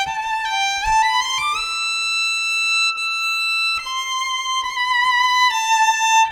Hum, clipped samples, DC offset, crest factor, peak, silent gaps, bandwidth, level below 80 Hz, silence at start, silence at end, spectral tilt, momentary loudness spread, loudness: none; under 0.1%; under 0.1%; 12 dB; -6 dBFS; none; 18 kHz; -46 dBFS; 0 s; 0 s; 3 dB/octave; 6 LU; -17 LUFS